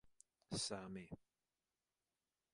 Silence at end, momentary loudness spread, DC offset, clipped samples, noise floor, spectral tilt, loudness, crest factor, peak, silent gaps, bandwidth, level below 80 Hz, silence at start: 1.35 s; 15 LU; under 0.1%; under 0.1%; under -90 dBFS; -3.5 dB/octave; -47 LUFS; 22 dB; -30 dBFS; none; 11 kHz; -76 dBFS; 0.05 s